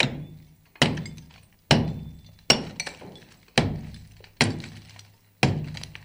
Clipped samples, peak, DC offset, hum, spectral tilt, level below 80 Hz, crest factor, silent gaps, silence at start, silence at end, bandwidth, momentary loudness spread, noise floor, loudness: under 0.1%; -2 dBFS; under 0.1%; none; -4 dB/octave; -48 dBFS; 26 dB; none; 0 s; 0 s; 16.5 kHz; 22 LU; -52 dBFS; -25 LUFS